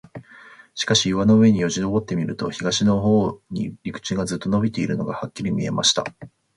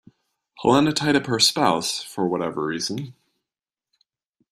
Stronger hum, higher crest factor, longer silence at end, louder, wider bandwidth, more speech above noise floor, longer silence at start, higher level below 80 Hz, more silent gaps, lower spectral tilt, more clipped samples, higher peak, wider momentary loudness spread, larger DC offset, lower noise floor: neither; about the same, 16 dB vs 20 dB; second, 0.3 s vs 1.4 s; about the same, -21 LUFS vs -21 LUFS; second, 11.5 kHz vs 14 kHz; second, 26 dB vs over 69 dB; second, 0.15 s vs 0.6 s; first, -50 dBFS vs -60 dBFS; neither; about the same, -4.5 dB/octave vs -3.5 dB/octave; neither; about the same, -4 dBFS vs -4 dBFS; about the same, 12 LU vs 10 LU; neither; second, -47 dBFS vs under -90 dBFS